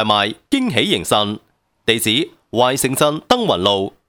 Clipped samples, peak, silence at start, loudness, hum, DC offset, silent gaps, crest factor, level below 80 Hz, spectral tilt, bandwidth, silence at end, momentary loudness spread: under 0.1%; 0 dBFS; 0 s; -17 LUFS; none; under 0.1%; none; 18 dB; -52 dBFS; -3.5 dB/octave; 18.5 kHz; 0.2 s; 6 LU